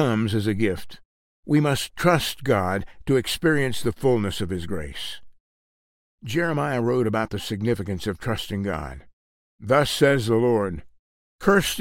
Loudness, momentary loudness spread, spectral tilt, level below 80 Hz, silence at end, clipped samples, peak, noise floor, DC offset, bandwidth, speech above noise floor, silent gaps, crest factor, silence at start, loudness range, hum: -23 LUFS; 12 LU; -5.5 dB/octave; -46 dBFS; 0 s; under 0.1%; -4 dBFS; under -90 dBFS; under 0.1%; 16.5 kHz; over 67 dB; 1.05-1.43 s, 5.40-6.18 s, 9.13-9.59 s, 10.99-11.39 s; 20 dB; 0 s; 4 LU; none